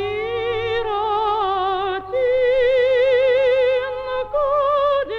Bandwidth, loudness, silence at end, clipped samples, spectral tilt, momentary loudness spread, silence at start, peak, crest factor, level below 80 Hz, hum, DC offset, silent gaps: 6 kHz; -19 LUFS; 0 s; under 0.1%; -5.5 dB/octave; 7 LU; 0 s; -8 dBFS; 10 dB; -44 dBFS; none; under 0.1%; none